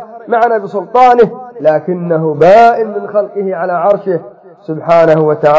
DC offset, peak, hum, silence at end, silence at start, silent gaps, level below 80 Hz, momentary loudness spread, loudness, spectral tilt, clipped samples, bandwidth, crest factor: under 0.1%; 0 dBFS; none; 0 s; 0 s; none; -52 dBFS; 10 LU; -10 LUFS; -7.5 dB/octave; 1%; 7.8 kHz; 10 dB